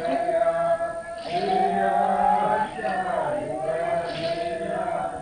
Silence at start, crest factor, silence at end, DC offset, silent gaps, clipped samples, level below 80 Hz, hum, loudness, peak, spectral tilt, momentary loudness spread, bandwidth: 0 s; 14 dB; 0 s; under 0.1%; none; under 0.1%; -54 dBFS; none; -25 LUFS; -10 dBFS; -5.5 dB/octave; 7 LU; 10 kHz